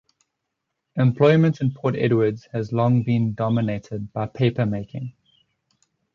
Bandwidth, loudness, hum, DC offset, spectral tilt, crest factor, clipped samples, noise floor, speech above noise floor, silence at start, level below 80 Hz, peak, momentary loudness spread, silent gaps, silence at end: 6.8 kHz; -22 LUFS; none; under 0.1%; -9 dB/octave; 18 dB; under 0.1%; -80 dBFS; 59 dB; 0.95 s; -56 dBFS; -4 dBFS; 14 LU; none; 1.05 s